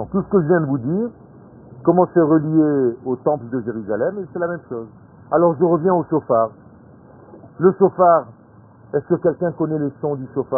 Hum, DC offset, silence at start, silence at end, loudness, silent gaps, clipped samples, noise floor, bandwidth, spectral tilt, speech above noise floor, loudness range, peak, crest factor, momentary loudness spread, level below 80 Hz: none; under 0.1%; 0 s; 0 s; -19 LUFS; none; under 0.1%; -46 dBFS; 1.8 kHz; -15.5 dB/octave; 28 dB; 2 LU; -2 dBFS; 18 dB; 10 LU; -56 dBFS